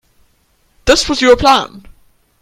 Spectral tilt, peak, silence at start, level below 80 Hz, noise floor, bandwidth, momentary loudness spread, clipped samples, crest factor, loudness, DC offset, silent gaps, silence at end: -3 dB/octave; 0 dBFS; 0.85 s; -32 dBFS; -57 dBFS; 15.5 kHz; 11 LU; 0.2%; 14 dB; -11 LUFS; under 0.1%; none; 0.65 s